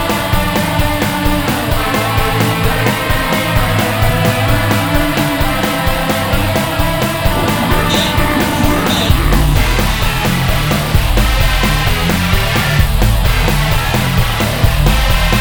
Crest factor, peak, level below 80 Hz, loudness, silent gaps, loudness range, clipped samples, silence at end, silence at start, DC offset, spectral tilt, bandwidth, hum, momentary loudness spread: 12 dB; 0 dBFS; -18 dBFS; -13 LUFS; none; 1 LU; under 0.1%; 0 s; 0 s; 0.4%; -4.5 dB/octave; over 20 kHz; none; 2 LU